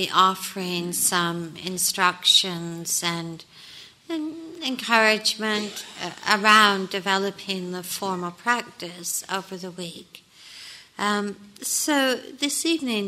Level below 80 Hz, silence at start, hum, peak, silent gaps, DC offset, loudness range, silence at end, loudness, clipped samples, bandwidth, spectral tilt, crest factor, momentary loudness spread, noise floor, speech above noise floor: -70 dBFS; 0 s; none; -2 dBFS; none; under 0.1%; 8 LU; 0 s; -23 LUFS; under 0.1%; 16 kHz; -2 dB/octave; 22 dB; 19 LU; -46 dBFS; 22 dB